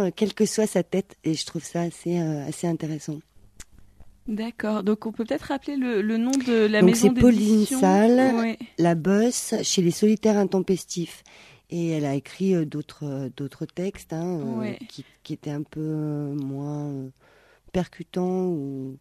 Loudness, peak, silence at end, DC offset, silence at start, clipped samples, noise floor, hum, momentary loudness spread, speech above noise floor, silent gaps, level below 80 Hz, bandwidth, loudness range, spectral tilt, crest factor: -24 LUFS; -4 dBFS; 0.05 s; under 0.1%; 0 s; under 0.1%; -55 dBFS; none; 15 LU; 32 dB; none; -52 dBFS; 14 kHz; 12 LU; -5.5 dB/octave; 20 dB